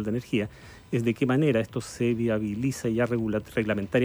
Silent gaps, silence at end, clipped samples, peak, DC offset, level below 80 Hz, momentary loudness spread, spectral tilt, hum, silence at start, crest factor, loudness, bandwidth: none; 0 s; under 0.1%; -12 dBFS; under 0.1%; -54 dBFS; 6 LU; -6.5 dB/octave; none; 0 s; 14 dB; -27 LUFS; over 20 kHz